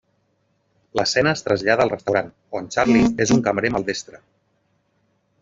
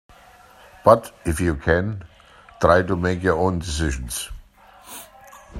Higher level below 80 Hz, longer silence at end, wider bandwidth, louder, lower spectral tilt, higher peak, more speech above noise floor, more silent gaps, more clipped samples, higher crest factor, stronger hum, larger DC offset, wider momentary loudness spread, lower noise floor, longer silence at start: second, -50 dBFS vs -38 dBFS; first, 1.25 s vs 0 s; second, 7.8 kHz vs 16 kHz; about the same, -20 LUFS vs -21 LUFS; about the same, -4.5 dB/octave vs -5.5 dB/octave; about the same, -2 dBFS vs 0 dBFS; first, 47 dB vs 29 dB; neither; neither; about the same, 18 dB vs 22 dB; neither; neither; second, 13 LU vs 20 LU; first, -67 dBFS vs -49 dBFS; about the same, 0.95 s vs 0.85 s